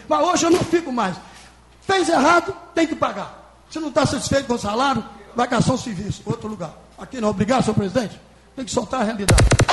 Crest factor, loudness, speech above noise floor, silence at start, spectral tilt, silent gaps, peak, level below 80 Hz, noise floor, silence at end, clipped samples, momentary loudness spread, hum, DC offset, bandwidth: 16 dB; -20 LUFS; 27 dB; 0 s; -5 dB/octave; none; -4 dBFS; -34 dBFS; -47 dBFS; 0 s; under 0.1%; 17 LU; none; under 0.1%; 11.5 kHz